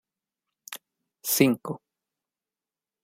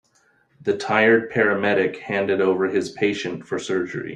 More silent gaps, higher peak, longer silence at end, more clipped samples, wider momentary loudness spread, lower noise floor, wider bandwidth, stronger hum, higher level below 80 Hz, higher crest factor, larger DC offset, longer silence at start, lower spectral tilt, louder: neither; about the same, -4 dBFS vs -4 dBFS; first, 1.25 s vs 0 s; neither; first, 20 LU vs 10 LU; first, under -90 dBFS vs -62 dBFS; first, 16 kHz vs 10 kHz; neither; second, -76 dBFS vs -64 dBFS; first, 26 dB vs 18 dB; neither; about the same, 0.7 s vs 0.6 s; second, -4 dB/octave vs -5.5 dB/octave; second, -24 LUFS vs -21 LUFS